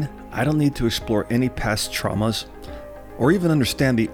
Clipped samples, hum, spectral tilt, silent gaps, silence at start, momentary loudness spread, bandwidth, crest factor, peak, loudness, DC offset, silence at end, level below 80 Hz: under 0.1%; none; -5.5 dB/octave; none; 0 s; 17 LU; 18.5 kHz; 16 dB; -6 dBFS; -21 LUFS; under 0.1%; 0 s; -38 dBFS